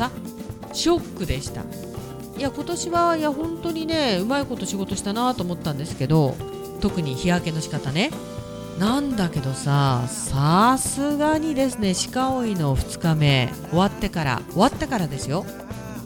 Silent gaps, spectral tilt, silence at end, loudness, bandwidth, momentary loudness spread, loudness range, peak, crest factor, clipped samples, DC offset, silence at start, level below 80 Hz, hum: none; -5 dB/octave; 0 s; -23 LUFS; 18.5 kHz; 13 LU; 4 LU; -4 dBFS; 18 dB; under 0.1%; under 0.1%; 0 s; -42 dBFS; none